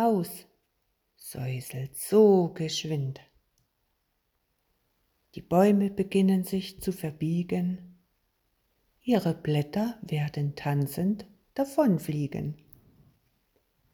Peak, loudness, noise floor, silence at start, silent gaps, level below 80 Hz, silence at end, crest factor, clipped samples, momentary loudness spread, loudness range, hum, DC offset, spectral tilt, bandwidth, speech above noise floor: -10 dBFS; -28 LUFS; -76 dBFS; 0 s; none; -62 dBFS; 1.4 s; 20 dB; under 0.1%; 16 LU; 4 LU; none; under 0.1%; -7 dB/octave; 20 kHz; 49 dB